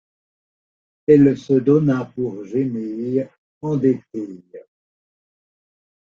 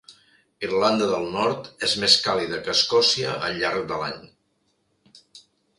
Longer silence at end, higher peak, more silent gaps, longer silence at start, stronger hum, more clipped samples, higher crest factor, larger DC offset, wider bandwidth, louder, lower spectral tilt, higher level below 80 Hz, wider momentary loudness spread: first, 1.55 s vs 0.4 s; about the same, -2 dBFS vs -2 dBFS; first, 3.38-3.61 s vs none; first, 1.1 s vs 0.1 s; neither; neither; about the same, 18 dB vs 22 dB; neither; second, 7.2 kHz vs 11.5 kHz; about the same, -19 LUFS vs -21 LUFS; first, -9.5 dB/octave vs -2.5 dB/octave; about the same, -60 dBFS vs -60 dBFS; first, 17 LU vs 12 LU